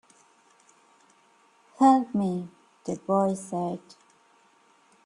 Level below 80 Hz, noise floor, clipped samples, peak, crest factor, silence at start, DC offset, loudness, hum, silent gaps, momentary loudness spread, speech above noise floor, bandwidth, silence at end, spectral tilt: -72 dBFS; -62 dBFS; under 0.1%; -8 dBFS; 22 dB; 1.8 s; under 0.1%; -26 LUFS; none; none; 19 LU; 37 dB; 11.5 kHz; 1.25 s; -7 dB/octave